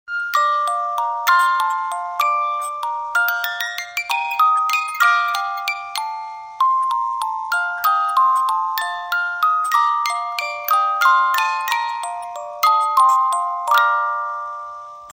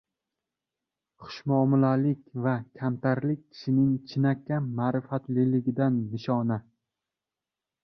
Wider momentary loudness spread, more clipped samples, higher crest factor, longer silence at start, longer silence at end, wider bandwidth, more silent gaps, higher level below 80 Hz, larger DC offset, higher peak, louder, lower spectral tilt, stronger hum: about the same, 10 LU vs 8 LU; neither; about the same, 18 dB vs 18 dB; second, 0.1 s vs 1.2 s; second, 0 s vs 1.25 s; first, 16.5 kHz vs 6.2 kHz; neither; second, -72 dBFS vs -66 dBFS; neither; first, -2 dBFS vs -10 dBFS; first, -18 LUFS vs -27 LUFS; second, 2.5 dB/octave vs -9.5 dB/octave; neither